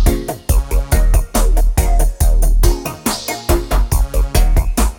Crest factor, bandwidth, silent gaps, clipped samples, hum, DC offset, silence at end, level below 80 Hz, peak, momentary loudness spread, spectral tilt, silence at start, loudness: 12 dB; 18.5 kHz; none; under 0.1%; none; under 0.1%; 0.05 s; -14 dBFS; 0 dBFS; 4 LU; -5 dB/octave; 0 s; -17 LUFS